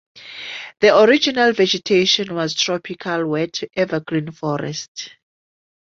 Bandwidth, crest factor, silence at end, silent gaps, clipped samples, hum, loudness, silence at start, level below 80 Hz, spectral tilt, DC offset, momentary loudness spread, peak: 7.6 kHz; 18 dB; 0.85 s; 4.88-4.95 s; under 0.1%; none; -18 LUFS; 0.15 s; -60 dBFS; -4 dB/octave; under 0.1%; 17 LU; -2 dBFS